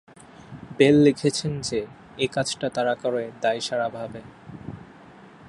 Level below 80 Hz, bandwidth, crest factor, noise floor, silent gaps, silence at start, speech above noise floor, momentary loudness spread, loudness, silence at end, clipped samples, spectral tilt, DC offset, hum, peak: -58 dBFS; 11.5 kHz; 22 dB; -47 dBFS; none; 0.5 s; 25 dB; 23 LU; -23 LUFS; 0.05 s; under 0.1%; -5 dB/octave; under 0.1%; none; -4 dBFS